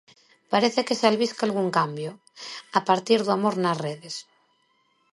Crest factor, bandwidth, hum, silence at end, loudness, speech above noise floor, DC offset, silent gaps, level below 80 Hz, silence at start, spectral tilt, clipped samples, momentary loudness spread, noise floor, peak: 22 dB; 11.5 kHz; none; 0.9 s; -24 LUFS; 43 dB; under 0.1%; none; -76 dBFS; 0.5 s; -4.5 dB/octave; under 0.1%; 15 LU; -67 dBFS; -4 dBFS